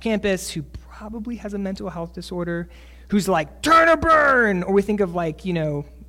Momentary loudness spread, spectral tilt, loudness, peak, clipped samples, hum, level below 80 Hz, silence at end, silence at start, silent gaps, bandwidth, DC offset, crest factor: 18 LU; -5.5 dB/octave; -20 LUFS; -6 dBFS; under 0.1%; none; -42 dBFS; 0.05 s; 0 s; none; 16.5 kHz; under 0.1%; 14 dB